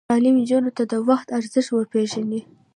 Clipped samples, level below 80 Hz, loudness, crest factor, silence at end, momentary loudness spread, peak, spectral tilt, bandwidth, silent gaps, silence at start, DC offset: under 0.1%; -68 dBFS; -21 LUFS; 14 dB; 0.35 s; 8 LU; -6 dBFS; -5.5 dB/octave; 10.5 kHz; none; 0.1 s; under 0.1%